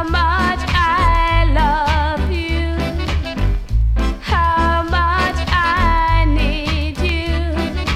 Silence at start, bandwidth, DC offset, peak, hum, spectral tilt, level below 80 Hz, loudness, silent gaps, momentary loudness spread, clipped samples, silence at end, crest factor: 0 s; 12.5 kHz; under 0.1%; -2 dBFS; none; -6 dB/octave; -18 dBFS; -17 LUFS; none; 6 LU; under 0.1%; 0 s; 14 dB